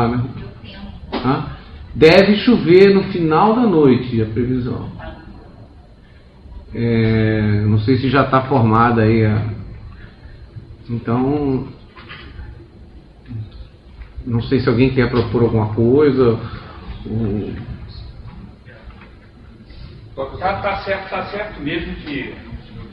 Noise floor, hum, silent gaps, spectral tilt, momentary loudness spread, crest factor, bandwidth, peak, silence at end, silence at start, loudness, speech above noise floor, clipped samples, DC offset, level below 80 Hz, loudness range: -43 dBFS; none; none; -9 dB/octave; 23 LU; 18 dB; 6.6 kHz; 0 dBFS; 0 s; 0 s; -16 LUFS; 29 dB; under 0.1%; under 0.1%; -36 dBFS; 14 LU